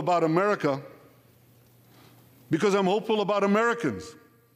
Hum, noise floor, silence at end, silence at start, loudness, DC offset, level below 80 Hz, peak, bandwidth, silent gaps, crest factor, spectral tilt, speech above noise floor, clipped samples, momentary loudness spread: none; -58 dBFS; 0.45 s; 0 s; -25 LUFS; under 0.1%; -70 dBFS; -12 dBFS; 15.5 kHz; none; 14 dB; -6 dB/octave; 33 dB; under 0.1%; 10 LU